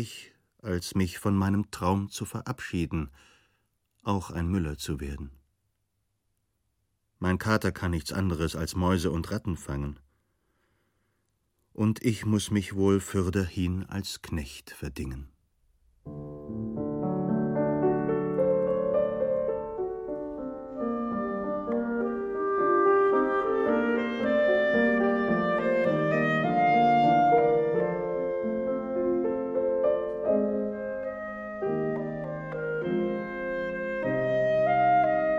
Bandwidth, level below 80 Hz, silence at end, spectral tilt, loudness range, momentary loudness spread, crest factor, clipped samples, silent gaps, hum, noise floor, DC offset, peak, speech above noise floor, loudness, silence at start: 16.5 kHz; -50 dBFS; 0 s; -6.5 dB/octave; 10 LU; 13 LU; 18 dB; under 0.1%; none; none; -78 dBFS; under 0.1%; -10 dBFS; 48 dB; -28 LUFS; 0 s